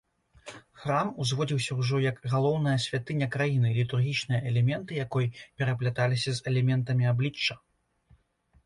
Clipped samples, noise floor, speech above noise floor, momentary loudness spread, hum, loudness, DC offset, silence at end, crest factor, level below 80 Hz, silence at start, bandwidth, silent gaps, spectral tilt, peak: under 0.1%; -66 dBFS; 39 dB; 6 LU; none; -28 LUFS; under 0.1%; 1.1 s; 16 dB; -62 dBFS; 0.45 s; 11.5 kHz; none; -6 dB/octave; -12 dBFS